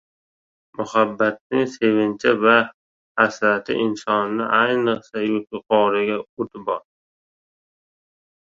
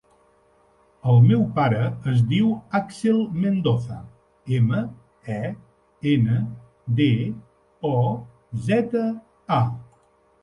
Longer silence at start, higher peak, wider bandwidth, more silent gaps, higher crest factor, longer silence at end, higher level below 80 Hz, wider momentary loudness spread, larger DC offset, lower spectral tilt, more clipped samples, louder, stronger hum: second, 0.8 s vs 1.05 s; first, -2 dBFS vs -6 dBFS; second, 7.8 kHz vs 10.5 kHz; first, 1.41-1.50 s, 2.74-3.15 s, 6.29-6.37 s vs none; about the same, 20 dB vs 16 dB; first, 1.7 s vs 0.6 s; second, -64 dBFS vs -56 dBFS; second, 11 LU vs 15 LU; neither; second, -5.5 dB/octave vs -8.5 dB/octave; neither; about the same, -20 LUFS vs -22 LUFS; neither